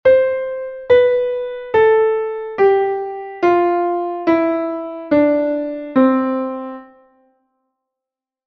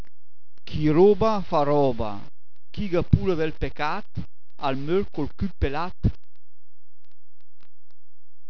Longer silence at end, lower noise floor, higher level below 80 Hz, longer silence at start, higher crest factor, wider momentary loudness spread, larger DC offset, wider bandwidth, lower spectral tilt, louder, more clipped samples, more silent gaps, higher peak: second, 1.6 s vs 2.4 s; second, -86 dBFS vs under -90 dBFS; second, -56 dBFS vs -38 dBFS; second, 0.05 s vs 0.65 s; second, 14 dB vs 24 dB; second, 12 LU vs 16 LU; second, under 0.1% vs 5%; about the same, 5.8 kHz vs 5.4 kHz; about the same, -7.5 dB/octave vs -8.5 dB/octave; first, -17 LUFS vs -24 LUFS; neither; neither; about the same, -2 dBFS vs -2 dBFS